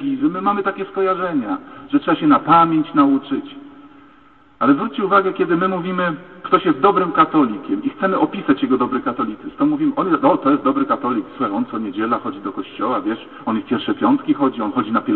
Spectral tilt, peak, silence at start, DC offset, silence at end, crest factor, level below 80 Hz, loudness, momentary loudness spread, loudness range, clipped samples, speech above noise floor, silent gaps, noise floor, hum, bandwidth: -10.5 dB/octave; -2 dBFS; 0 s; 0.2%; 0 s; 16 dB; -58 dBFS; -18 LUFS; 9 LU; 4 LU; under 0.1%; 32 dB; none; -50 dBFS; none; 4.3 kHz